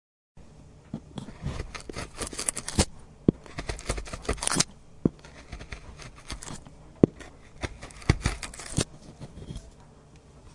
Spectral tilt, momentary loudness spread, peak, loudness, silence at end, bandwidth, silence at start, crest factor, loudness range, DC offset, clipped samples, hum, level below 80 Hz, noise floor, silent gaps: -4 dB/octave; 20 LU; 0 dBFS; -31 LUFS; 0 s; 11.5 kHz; 0.35 s; 32 dB; 4 LU; under 0.1%; under 0.1%; none; -42 dBFS; -52 dBFS; none